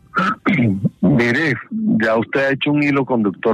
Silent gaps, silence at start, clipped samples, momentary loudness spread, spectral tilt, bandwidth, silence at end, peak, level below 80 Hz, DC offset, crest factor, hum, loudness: none; 0.15 s; under 0.1%; 4 LU; -7.5 dB/octave; 9.4 kHz; 0 s; -4 dBFS; -52 dBFS; under 0.1%; 14 dB; none; -17 LUFS